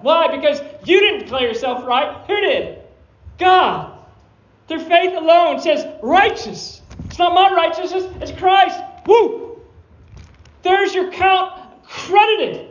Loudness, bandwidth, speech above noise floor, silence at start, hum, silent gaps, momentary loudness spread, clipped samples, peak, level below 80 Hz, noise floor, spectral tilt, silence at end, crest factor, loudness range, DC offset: -16 LUFS; 7.4 kHz; 36 dB; 0.05 s; none; none; 15 LU; under 0.1%; 0 dBFS; -46 dBFS; -51 dBFS; -4 dB/octave; 0.05 s; 16 dB; 3 LU; under 0.1%